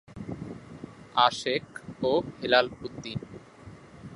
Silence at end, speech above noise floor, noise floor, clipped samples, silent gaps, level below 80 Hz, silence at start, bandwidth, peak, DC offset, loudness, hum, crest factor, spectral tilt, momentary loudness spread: 0 s; 22 dB; -49 dBFS; under 0.1%; none; -58 dBFS; 0.1 s; 11.5 kHz; -6 dBFS; under 0.1%; -28 LUFS; none; 24 dB; -4.5 dB/octave; 23 LU